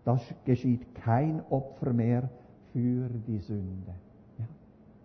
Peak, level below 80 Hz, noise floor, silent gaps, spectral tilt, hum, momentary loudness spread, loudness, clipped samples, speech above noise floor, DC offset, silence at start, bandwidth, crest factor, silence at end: -12 dBFS; -56 dBFS; -55 dBFS; none; -10.5 dB/octave; none; 15 LU; -31 LUFS; under 0.1%; 26 dB; under 0.1%; 0.05 s; 6.2 kHz; 18 dB; 0.5 s